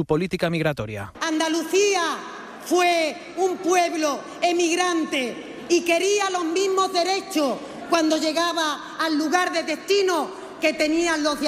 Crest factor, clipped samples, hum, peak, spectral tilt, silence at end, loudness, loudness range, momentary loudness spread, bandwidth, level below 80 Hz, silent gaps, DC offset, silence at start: 16 dB; under 0.1%; none; -6 dBFS; -3.5 dB/octave; 0 s; -22 LUFS; 1 LU; 7 LU; 15 kHz; -58 dBFS; none; under 0.1%; 0 s